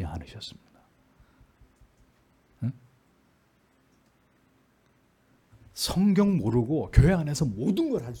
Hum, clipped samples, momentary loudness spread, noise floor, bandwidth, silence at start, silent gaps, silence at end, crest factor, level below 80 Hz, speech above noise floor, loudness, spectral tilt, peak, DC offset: none; under 0.1%; 19 LU; -65 dBFS; 18 kHz; 0 s; none; 0 s; 24 dB; -40 dBFS; 41 dB; -26 LUFS; -6.5 dB/octave; -4 dBFS; under 0.1%